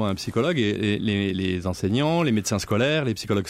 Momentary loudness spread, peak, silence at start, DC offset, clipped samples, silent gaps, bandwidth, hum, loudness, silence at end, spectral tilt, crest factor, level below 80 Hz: 4 LU; -10 dBFS; 0 s; under 0.1%; under 0.1%; none; 16 kHz; none; -24 LUFS; 0 s; -5.5 dB/octave; 12 dB; -52 dBFS